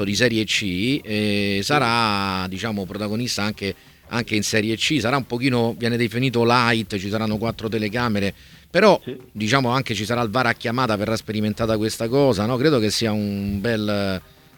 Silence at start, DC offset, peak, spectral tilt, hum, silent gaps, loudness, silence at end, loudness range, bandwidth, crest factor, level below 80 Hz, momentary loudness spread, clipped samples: 0 s; under 0.1%; -2 dBFS; -5 dB/octave; none; none; -21 LUFS; 0.35 s; 2 LU; 19 kHz; 20 dB; -50 dBFS; 8 LU; under 0.1%